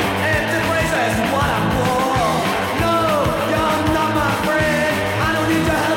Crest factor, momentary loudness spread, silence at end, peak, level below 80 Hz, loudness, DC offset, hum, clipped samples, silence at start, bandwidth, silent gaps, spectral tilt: 12 dB; 1 LU; 0 s; -4 dBFS; -36 dBFS; -18 LUFS; under 0.1%; none; under 0.1%; 0 s; 17 kHz; none; -5 dB/octave